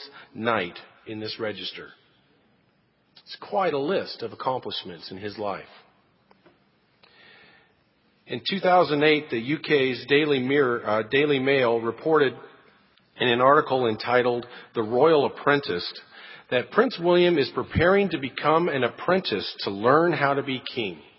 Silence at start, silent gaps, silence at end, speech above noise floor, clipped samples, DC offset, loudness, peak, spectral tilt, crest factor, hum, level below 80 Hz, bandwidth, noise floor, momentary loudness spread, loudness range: 0 s; none; 0.2 s; 42 dB; under 0.1%; under 0.1%; -23 LUFS; -4 dBFS; -10 dB/octave; 20 dB; none; -56 dBFS; 5.8 kHz; -66 dBFS; 15 LU; 11 LU